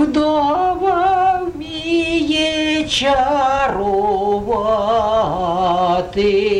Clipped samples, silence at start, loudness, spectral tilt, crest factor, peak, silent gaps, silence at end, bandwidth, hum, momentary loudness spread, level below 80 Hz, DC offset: under 0.1%; 0 s; -16 LUFS; -4.5 dB/octave; 12 dB; -4 dBFS; none; 0 s; 11.5 kHz; none; 3 LU; -38 dBFS; under 0.1%